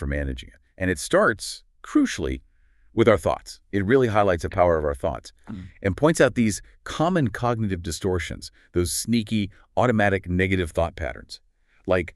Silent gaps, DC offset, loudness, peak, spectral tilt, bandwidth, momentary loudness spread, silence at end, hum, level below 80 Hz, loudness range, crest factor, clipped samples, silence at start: none; under 0.1%; -23 LUFS; -4 dBFS; -5.5 dB/octave; 13.5 kHz; 16 LU; 0.05 s; none; -40 dBFS; 2 LU; 20 dB; under 0.1%; 0 s